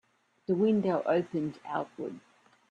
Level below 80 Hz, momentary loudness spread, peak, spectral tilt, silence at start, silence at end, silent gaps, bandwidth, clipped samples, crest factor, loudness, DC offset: -76 dBFS; 15 LU; -14 dBFS; -8.5 dB/octave; 0.5 s; 0.5 s; none; 7.8 kHz; under 0.1%; 16 dB; -30 LUFS; under 0.1%